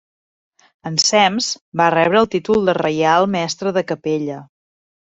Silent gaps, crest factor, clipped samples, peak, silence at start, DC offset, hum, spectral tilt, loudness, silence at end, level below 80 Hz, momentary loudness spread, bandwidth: 1.61-1.72 s; 16 dB; under 0.1%; -2 dBFS; 0.85 s; under 0.1%; none; -3.5 dB/octave; -17 LUFS; 0.75 s; -58 dBFS; 9 LU; 8.2 kHz